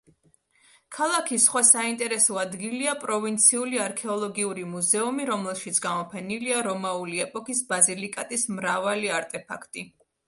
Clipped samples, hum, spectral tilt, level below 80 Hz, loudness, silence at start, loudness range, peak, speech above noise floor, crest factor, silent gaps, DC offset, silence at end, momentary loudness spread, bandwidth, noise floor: under 0.1%; none; -2 dB/octave; -74 dBFS; -24 LUFS; 0.9 s; 5 LU; -2 dBFS; 38 dB; 24 dB; none; under 0.1%; 0.4 s; 13 LU; 12 kHz; -64 dBFS